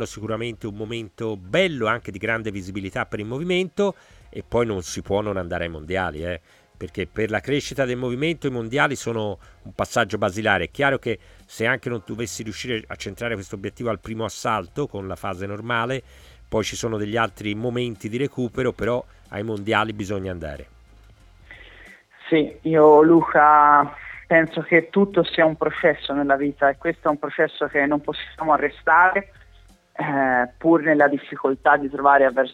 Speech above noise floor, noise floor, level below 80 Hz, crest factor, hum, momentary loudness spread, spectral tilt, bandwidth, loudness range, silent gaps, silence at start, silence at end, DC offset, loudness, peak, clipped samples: 30 dB; -51 dBFS; -50 dBFS; 20 dB; none; 15 LU; -5.5 dB/octave; 15 kHz; 10 LU; none; 0 s; 0 s; under 0.1%; -22 LUFS; -2 dBFS; under 0.1%